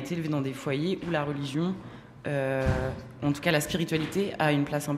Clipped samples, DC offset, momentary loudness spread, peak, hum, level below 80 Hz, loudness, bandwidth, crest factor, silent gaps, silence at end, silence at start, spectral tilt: under 0.1%; under 0.1%; 7 LU; -10 dBFS; none; -48 dBFS; -29 LUFS; 15.5 kHz; 18 dB; none; 0 s; 0 s; -5.5 dB/octave